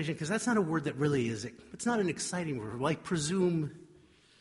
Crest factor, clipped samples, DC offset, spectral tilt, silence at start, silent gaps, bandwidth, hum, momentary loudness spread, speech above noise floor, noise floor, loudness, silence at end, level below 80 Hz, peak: 16 dB; under 0.1%; under 0.1%; -5 dB/octave; 0 s; none; 11.5 kHz; none; 7 LU; 29 dB; -61 dBFS; -32 LUFS; 0.55 s; -64 dBFS; -16 dBFS